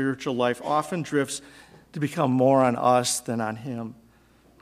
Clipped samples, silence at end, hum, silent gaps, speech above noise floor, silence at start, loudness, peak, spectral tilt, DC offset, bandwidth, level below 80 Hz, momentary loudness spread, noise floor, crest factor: under 0.1%; 0.65 s; none; none; 33 dB; 0 s; -24 LUFS; -8 dBFS; -5 dB/octave; under 0.1%; 15.5 kHz; -66 dBFS; 15 LU; -58 dBFS; 18 dB